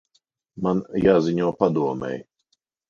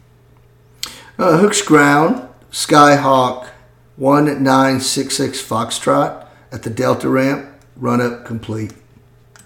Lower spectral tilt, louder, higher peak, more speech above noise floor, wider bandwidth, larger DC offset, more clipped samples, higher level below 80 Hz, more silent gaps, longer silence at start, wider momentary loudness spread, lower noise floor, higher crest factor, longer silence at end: first, -8 dB/octave vs -4.5 dB/octave; second, -22 LUFS vs -14 LUFS; second, -4 dBFS vs 0 dBFS; first, 51 dB vs 34 dB; second, 7.2 kHz vs 18 kHz; neither; neither; about the same, -52 dBFS vs -54 dBFS; neither; second, 0.55 s vs 0.85 s; second, 12 LU vs 18 LU; first, -72 dBFS vs -48 dBFS; about the same, 20 dB vs 16 dB; about the same, 0.65 s vs 0.75 s